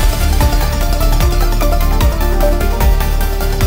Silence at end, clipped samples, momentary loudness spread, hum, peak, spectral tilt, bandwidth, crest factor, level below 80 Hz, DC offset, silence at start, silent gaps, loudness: 0 s; under 0.1%; 2 LU; none; -2 dBFS; -5 dB/octave; 16.5 kHz; 10 dB; -12 dBFS; under 0.1%; 0 s; none; -15 LUFS